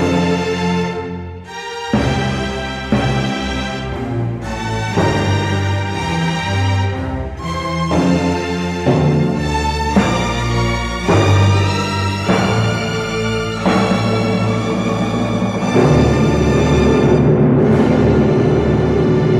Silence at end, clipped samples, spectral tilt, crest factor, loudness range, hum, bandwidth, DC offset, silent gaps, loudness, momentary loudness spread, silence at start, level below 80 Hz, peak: 0 s; under 0.1%; -6.5 dB/octave; 14 dB; 6 LU; none; 12.5 kHz; under 0.1%; none; -16 LUFS; 9 LU; 0 s; -30 dBFS; -2 dBFS